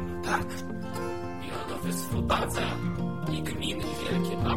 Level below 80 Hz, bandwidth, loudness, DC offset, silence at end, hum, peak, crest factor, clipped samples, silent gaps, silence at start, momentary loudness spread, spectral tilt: -44 dBFS; 16.5 kHz; -31 LUFS; 0.9%; 0 s; none; -12 dBFS; 18 dB; under 0.1%; none; 0 s; 8 LU; -5 dB/octave